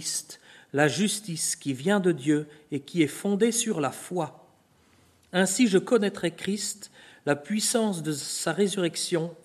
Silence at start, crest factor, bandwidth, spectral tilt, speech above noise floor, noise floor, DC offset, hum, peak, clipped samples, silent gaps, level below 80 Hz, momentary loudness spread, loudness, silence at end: 0 s; 20 dB; 13.5 kHz; -4 dB/octave; 35 dB; -61 dBFS; under 0.1%; none; -6 dBFS; under 0.1%; none; -72 dBFS; 10 LU; -27 LUFS; 0.1 s